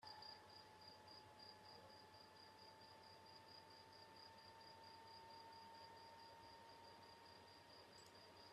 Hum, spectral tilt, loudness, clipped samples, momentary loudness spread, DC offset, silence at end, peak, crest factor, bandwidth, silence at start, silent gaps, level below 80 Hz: none; -3 dB/octave; -62 LUFS; under 0.1%; 3 LU; under 0.1%; 0 s; -46 dBFS; 16 dB; 13.5 kHz; 0 s; none; under -90 dBFS